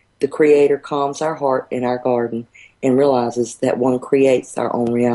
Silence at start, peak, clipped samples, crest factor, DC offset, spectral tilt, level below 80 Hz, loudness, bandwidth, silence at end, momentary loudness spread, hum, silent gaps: 0.2 s; -4 dBFS; under 0.1%; 14 dB; under 0.1%; -6 dB/octave; -60 dBFS; -18 LUFS; 11.5 kHz; 0 s; 8 LU; none; none